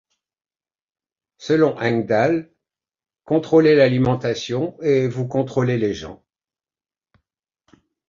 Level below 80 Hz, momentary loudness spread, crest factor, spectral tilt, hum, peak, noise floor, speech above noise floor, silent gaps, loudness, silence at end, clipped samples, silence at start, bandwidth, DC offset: -56 dBFS; 10 LU; 18 dB; -7 dB/octave; none; -2 dBFS; under -90 dBFS; over 72 dB; none; -19 LUFS; 1.95 s; under 0.1%; 1.4 s; 7.4 kHz; under 0.1%